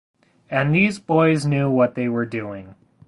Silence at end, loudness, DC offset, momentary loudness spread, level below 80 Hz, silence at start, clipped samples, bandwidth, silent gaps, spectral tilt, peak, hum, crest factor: 0.35 s; -20 LUFS; under 0.1%; 11 LU; -54 dBFS; 0.5 s; under 0.1%; 11.5 kHz; none; -7 dB/octave; -4 dBFS; none; 16 dB